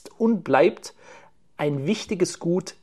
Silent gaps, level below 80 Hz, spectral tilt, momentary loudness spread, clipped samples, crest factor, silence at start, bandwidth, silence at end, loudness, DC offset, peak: none; -64 dBFS; -5.5 dB/octave; 9 LU; under 0.1%; 20 dB; 0.05 s; 12.5 kHz; 0.1 s; -23 LUFS; 0.2%; -4 dBFS